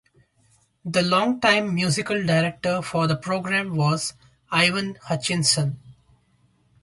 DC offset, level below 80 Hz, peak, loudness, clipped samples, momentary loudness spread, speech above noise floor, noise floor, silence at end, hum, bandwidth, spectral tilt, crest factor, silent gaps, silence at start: under 0.1%; -60 dBFS; -6 dBFS; -22 LUFS; under 0.1%; 9 LU; 40 dB; -63 dBFS; 0.9 s; none; 11.5 kHz; -4 dB/octave; 18 dB; none; 0.85 s